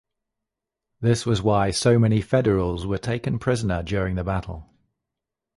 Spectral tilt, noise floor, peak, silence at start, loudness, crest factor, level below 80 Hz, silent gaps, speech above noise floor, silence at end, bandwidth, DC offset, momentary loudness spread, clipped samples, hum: -6 dB/octave; -85 dBFS; -6 dBFS; 1 s; -23 LUFS; 18 dB; -40 dBFS; none; 63 dB; 0.95 s; 11.5 kHz; under 0.1%; 8 LU; under 0.1%; none